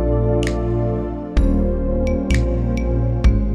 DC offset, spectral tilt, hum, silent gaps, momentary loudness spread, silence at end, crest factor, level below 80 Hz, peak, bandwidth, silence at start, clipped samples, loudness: under 0.1%; -8 dB/octave; none; none; 3 LU; 0 s; 14 dB; -20 dBFS; -4 dBFS; 10 kHz; 0 s; under 0.1%; -20 LUFS